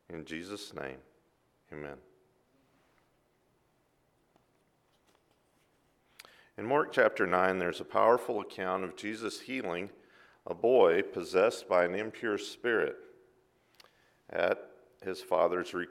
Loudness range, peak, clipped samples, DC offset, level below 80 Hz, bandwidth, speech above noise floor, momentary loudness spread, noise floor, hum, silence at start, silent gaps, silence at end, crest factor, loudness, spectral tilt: 10 LU; -12 dBFS; under 0.1%; under 0.1%; -74 dBFS; 14.5 kHz; 42 dB; 18 LU; -72 dBFS; none; 0.1 s; none; 0 s; 22 dB; -31 LUFS; -5 dB/octave